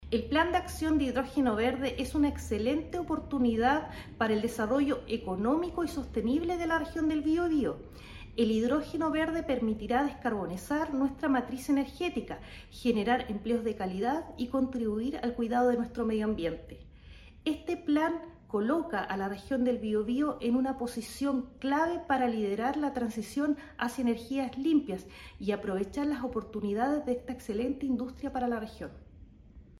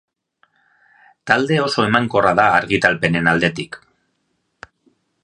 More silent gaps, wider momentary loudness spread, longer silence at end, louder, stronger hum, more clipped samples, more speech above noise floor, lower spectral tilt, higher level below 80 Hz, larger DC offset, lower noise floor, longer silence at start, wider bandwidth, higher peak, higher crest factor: neither; second, 7 LU vs 16 LU; second, 0.15 s vs 1.5 s; second, -31 LUFS vs -16 LUFS; neither; neither; second, 23 dB vs 53 dB; about the same, -6 dB/octave vs -5.5 dB/octave; about the same, -50 dBFS vs -50 dBFS; neither; second, -53 dBFS vs -69 dBFS; second, 0 s vs 1.25 s; first, 14 kHz vs 11 kHz; second, -14 dBFS vs 0 dBFS; about the same, 16 dB vs 20 dB